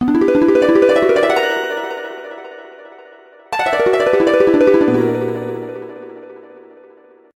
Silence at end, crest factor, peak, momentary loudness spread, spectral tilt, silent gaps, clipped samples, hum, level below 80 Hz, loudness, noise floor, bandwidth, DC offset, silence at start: 1 s; 14 dB; -2 dBFS; 21 LU; -6 dB/octave; none; under 0.1%; none; -52 dBFS; -14 LUFS; -45 dBFS; 15 kHz; under 0.1%; 0 s